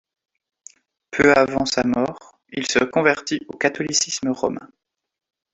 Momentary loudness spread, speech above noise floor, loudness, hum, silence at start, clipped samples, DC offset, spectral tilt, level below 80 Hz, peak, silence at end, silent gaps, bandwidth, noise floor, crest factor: 12 LU; 63 dB; -20 LUFS; none; 1.1 s; under 0.1%; under 0.1%; -3 dB/octave; -54 dBFS; -2 dBFS; 0.9 s; none; 8.4 kHz; -83 dBFS; 20 dB